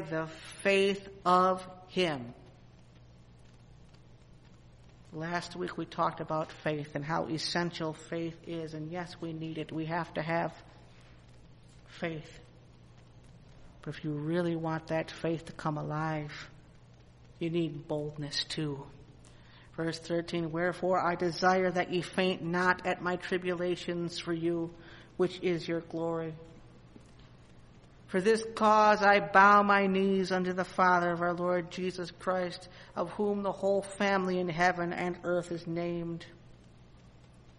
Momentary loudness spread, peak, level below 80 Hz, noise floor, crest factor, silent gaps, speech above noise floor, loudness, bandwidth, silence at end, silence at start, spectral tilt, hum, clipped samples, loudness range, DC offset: 14 LU; -8 dBFS; -62 dBFS; -56 dBFS; 24 dB; none; 25 dB; -31 LUFS; 11.5 kHz; 0.05 s; 0 s; -5.5 dB/octave; none; under 0.1%; 13 LU; under 0.1%